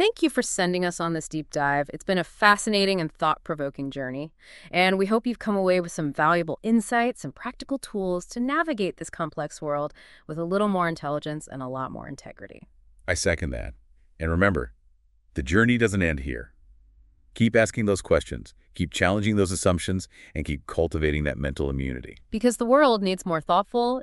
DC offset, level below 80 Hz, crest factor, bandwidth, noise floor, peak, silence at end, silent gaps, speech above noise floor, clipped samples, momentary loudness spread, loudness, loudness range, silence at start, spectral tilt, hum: under 0.1%; -42 dBFS; 22 dB; 12 kHz; -60 dBFS; -2 dBFS; 0 s; none; 35 dB; under 0.1%; 14 LU; -25 LUFS; 5 LU; 0 s; -5 dB/octave; none